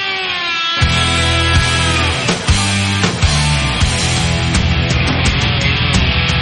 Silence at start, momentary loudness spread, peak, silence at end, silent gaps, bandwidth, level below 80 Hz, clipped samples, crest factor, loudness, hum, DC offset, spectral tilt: 0 s; 2 LU; 0 dBFS; 0 s; none; 11.5 kHz; -22 dBFS; under 0.1%; 14 dB; -13 LUFS; none; under 0.1%; -4 dB/octave